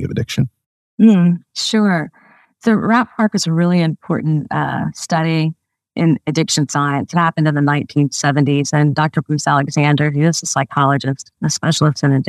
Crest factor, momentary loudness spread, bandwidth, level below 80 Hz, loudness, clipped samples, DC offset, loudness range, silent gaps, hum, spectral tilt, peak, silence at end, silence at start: 14 dB; 6 LU; 13 kHz; -56 dBFS; -16 LUFS; under 0.1%; under 0.1%; 2 LU; 0.66-0.98 s; none; -5.5 dB/octave; 0 dBFS; 0.05 s; 0 s